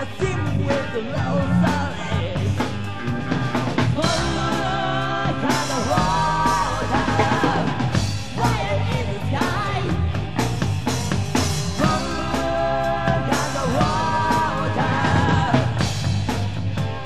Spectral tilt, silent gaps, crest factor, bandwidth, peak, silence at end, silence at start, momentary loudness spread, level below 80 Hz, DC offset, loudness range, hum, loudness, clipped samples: -5.5 dB/octave; none; 16 dB; 13.5 kHz; -6 dBFS; 0 s; 0 s; 5 LU; -36 dBFS; 2%; 2 LU; none; -22 LUFS; under 0.1%